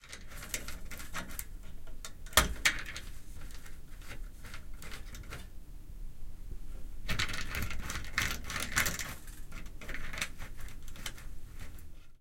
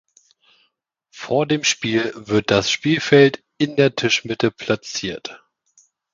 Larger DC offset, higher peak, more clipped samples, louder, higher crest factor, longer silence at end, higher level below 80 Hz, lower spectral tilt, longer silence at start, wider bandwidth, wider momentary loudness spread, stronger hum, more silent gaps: neither; second, -6 dBFS vs 0 dBFS; neither; second, -36 LUFS vs -19 LUFS; first, 30 dB vs 20 dB; second, 0.05 s vs 0.75 s; first, -44 dBFS vs -56 dBFS; second, -2 dB/octave vs -4 dB/octave; second, 0 s vs 1.15 s; first, 17 kHz vs 7.6 kHz; first, 21 LU vs 12 LU; neither; neither